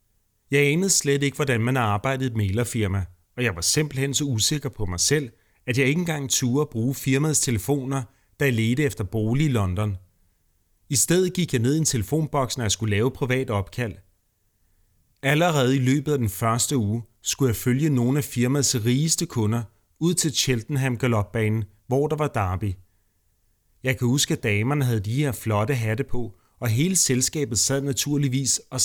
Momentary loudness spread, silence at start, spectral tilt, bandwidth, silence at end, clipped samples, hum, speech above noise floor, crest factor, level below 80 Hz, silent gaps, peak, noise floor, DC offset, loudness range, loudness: 8 LU; 0.5 s; -4.5 dB/octave; over 20 kHz; 0 s; under 0.1%; none; 45 dB; 18 dB; -48 dBFS; none; -6 dBFS; -68 dBFS; under 0.1%; 3 LU; -23 LUFS